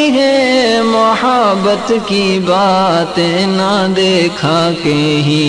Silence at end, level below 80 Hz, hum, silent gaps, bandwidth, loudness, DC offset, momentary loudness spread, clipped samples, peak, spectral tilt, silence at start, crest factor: 0 s; -46 dBFS; none; none; 10.5 kHz; -11 LUFS; under 0.1%; 3 LU; under 0.1%; 0 dBFS; -5 dB/octave; 0 s; 10 dB